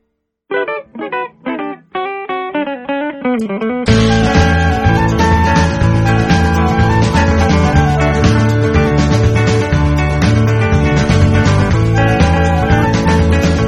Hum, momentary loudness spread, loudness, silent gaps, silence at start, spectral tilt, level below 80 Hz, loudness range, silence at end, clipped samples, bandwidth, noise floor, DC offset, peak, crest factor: none; 10 LU; -13 LUFS; none; 0.5 s; -6.5 dB/octave; -22 dBFS; 6 LU; 0 s; under 0.1%; 12 kHz; -64 dBFS; under 0.1%; 0 dBFS; 12 dB